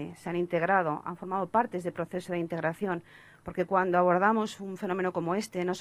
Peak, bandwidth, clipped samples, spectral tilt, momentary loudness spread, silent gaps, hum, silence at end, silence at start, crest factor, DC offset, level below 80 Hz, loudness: -12 dBFS; 14 kHz; under 0.1%; -6.5 dB/octave; 11 LU; none; none; 0 s; 0 s; 18 dB; under 0.1%; -66 dBFS; -30 LUFS